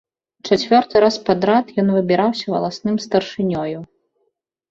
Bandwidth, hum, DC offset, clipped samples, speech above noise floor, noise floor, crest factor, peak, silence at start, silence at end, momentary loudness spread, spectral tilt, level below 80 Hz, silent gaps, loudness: 7.8 kHz; none; under 0.1%; under 0.1%; 53 dB; -70 dBFS; 16 dB; -2 dBFS; 0.45 s; 0.85 s; 8 LU; -6 dB/octave; -56 dBFS; none; -18 LUFS